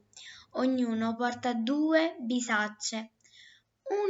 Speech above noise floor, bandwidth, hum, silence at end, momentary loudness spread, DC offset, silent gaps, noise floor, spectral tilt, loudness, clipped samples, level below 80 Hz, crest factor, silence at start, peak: 30 dB; 8 kHz; none; 0 s; 19 LU; under 0.1%; none; -59 dBFS; -3.5 dB/octave; -30 LUFS; under 0.1%; -82 dBFS; 16 dB; 0.15 s; -14 dBFS